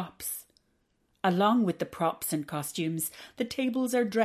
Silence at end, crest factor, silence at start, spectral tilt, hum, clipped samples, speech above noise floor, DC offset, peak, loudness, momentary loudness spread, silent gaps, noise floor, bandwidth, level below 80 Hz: 0 s; 18 dB; 0 s; -5 dB/octave; none; under 0.1%; 44 dB; under 0.1%; -12 dBFS; -30 LUFS; 11 LU; none; -73 dBFS; 14.5 kHz; -68 dBFS